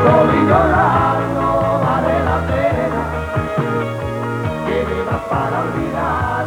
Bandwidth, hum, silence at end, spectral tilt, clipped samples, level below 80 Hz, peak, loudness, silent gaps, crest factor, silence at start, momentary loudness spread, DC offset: 18.5 kHz; none; 0 s; -7.5 dB/octave; under 0.1%; -34 dBFS; 0 dBFS; -17 LUFS; none; 16 dB; 0 s; 9 LU; under 0.1%